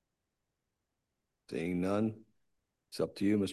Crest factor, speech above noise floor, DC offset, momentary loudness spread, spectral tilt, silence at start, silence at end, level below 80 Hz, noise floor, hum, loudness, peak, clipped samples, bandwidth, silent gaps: 18 dB; 53 dB; under 0.1%; 14 LU; -6.5 dB/octave; 1.5 s; 0 s; -64 dBFS; -86 dBFS; none; -35 LUFS; -20 dBFS; under 0.1%; 12.5 kHz; none